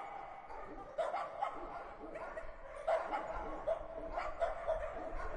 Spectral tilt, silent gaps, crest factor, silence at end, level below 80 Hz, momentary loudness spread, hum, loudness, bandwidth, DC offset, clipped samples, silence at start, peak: -5.5 dB/octave; none; 16 dB; 0 s; -52 dBFS; 11 LU; none; -42 LUFS; 10.5 kHz; under 0.1%; under 0.1%; 0 s; -24 dBFS